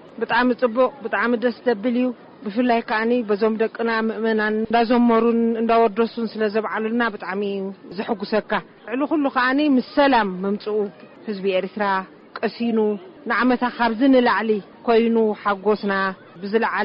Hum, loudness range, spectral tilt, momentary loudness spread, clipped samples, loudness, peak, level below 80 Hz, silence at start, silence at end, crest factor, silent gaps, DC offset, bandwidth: none; 4 LU; -3.5 dB/octave; 10 LU; under 0.1%; -21 LUFS; -6 dBFS; -58 dBFS; 0.05 s; 0 s; 14 dB; none; under 0.1%; 5.4 kHz